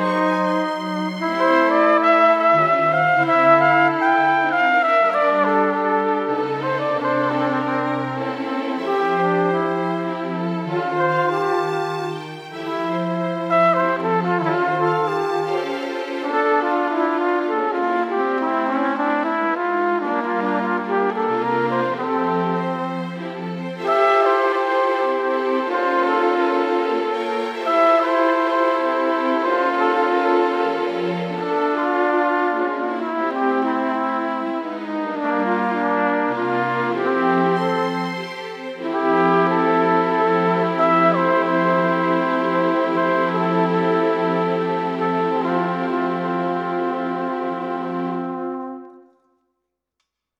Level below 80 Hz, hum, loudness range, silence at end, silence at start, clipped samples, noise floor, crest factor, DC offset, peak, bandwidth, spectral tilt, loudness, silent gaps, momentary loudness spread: -78 dBFS; none; 6 LU; 1.4 s; 0 s; under 0.1%; -77 dBFS; 18 dB; under 0.1%; -2 dBFS; 10 kHz; -7 dB/octave; -20 LUFS; none; 9 LU